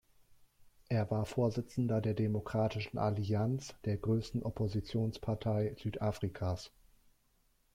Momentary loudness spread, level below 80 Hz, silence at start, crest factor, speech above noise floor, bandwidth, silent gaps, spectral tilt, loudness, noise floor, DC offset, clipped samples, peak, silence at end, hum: 5 LU; -58 dBFS; 0.6 s; 14 dB; 38 dB; 12 kHz; none; -7.5 dB/octave; -36 LUFS; -73 dBFS; under 0.1%; under 0.1%; -22 dBFS; 1.05 s; none